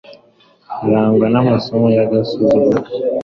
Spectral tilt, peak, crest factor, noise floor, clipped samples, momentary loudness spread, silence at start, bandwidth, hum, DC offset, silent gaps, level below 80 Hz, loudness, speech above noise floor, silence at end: -9 dB/octave; -2 dBFS; 12 dB; -51 dBFS; under 0.1%; 6 LU; 0.1 s; 6.4 kHz; none; under 0.1%; none; -50 dBFS; -14 LUFS; 37 dB; 0 s